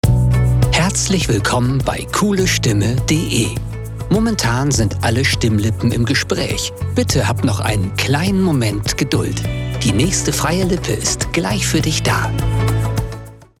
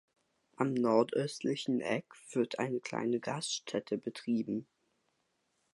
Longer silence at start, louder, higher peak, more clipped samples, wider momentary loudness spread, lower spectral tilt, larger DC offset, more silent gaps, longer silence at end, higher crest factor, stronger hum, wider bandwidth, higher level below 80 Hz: second, 0.05 s vs 0.6 s; first, -16 LUFS vs -35 LUFS; first, -2 dBFS vs -14 dBFS; neither; second, 5 LU vs 9 LU; about the same, -4.5 dB/octave vs -5 dB/octave; neither; neither; second, 0.2 s vs 1.1 s; second, 14 dB vs 22 dB; neither; first, 16.5 kHz vs 11.5 kHz; first, -28 dBFS vs -82 dBFS